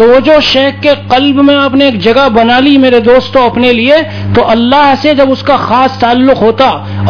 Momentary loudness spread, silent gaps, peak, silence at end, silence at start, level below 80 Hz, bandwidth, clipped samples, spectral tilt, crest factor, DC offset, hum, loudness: 4 LU; none; 0 dBFS; 0 s; 0 s; -36 dBFS; 5.4 kHz; 3%; -6.5 dB/octave; 6 dB; under 0.1%; none; -6 LUFS